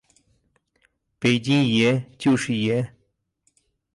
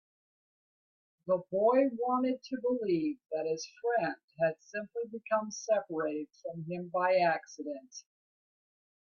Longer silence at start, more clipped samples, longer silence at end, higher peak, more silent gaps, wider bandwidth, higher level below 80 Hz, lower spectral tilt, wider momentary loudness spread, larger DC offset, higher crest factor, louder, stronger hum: about the same, 1.2 s vs 1.25 s; neither; about the same, 1.05 s vs 1.1 s; first, -6 dBFS vs -16 dBFS; second, none vs 4.24-4.28 s; first, 11.5 kHz vs 7.2 kHz; first, -62 dBFS vs -80 dBFS; about the same, -5.5 dB/octave vs -5.5 dB/octave; second, 6 LU vs 14 LU; neither; about the same, 18 dB vs 18 dB; first, -21 LUFS vs -33 LUFS; neither